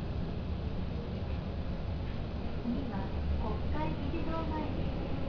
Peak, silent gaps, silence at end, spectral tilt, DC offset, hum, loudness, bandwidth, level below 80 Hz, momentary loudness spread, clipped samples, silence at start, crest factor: -22 dBFS; none; 0 s; -9 dB/octave; under 0.1%; none; -37 LUFS; 5.4 kHz; -38 dBFS; 3 LU; under 0.1%; 0 s; 12 dB